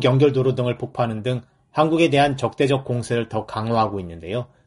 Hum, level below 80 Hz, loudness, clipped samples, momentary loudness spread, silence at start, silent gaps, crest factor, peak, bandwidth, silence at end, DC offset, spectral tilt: none; -52 dBFS; -21 LUFS; under 0.1%; 12 LU; 0 s; none; 16 dB; -4 dBFS; 11.5 kHz; 0.2 s; under 0.1%; -7 dB/octave